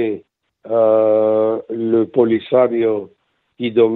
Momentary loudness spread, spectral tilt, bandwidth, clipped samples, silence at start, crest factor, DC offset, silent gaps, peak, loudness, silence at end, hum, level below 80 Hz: 9 LU; -10 dB/octave; 4.1 kHz; under 0.1%; 0 s; 14 dB; under 0.1%; none; -2 dBFS; -16 LUFS; 0 s; none; -64 dBFS